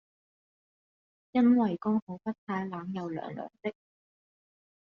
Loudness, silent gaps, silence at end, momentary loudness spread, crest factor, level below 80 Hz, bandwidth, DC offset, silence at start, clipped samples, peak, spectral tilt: -31 LUFS; 2.02-2.07 s, 2.38-2.47 s; 1.1 s; 15 LU; 18 dB; -74 dBFS; 5.8 kHz; under 0.1%; 1.35 s; under 0.1%; -14 dBFS; -7 dB/octave